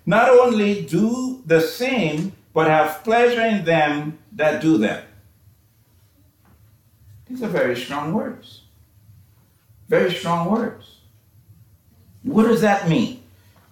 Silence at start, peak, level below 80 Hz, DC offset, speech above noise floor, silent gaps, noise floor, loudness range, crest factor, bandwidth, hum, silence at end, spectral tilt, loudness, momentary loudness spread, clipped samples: 0.05 s; -4 dBFS; -58 dBFS; under 0.1%; 38 dB; none; -56 dBFS; 9 LU; 18 dB; 18.5 kHz; none; 0.55 s; -6 dB/octave; -19 LUFS; 12 LU; under 0.1%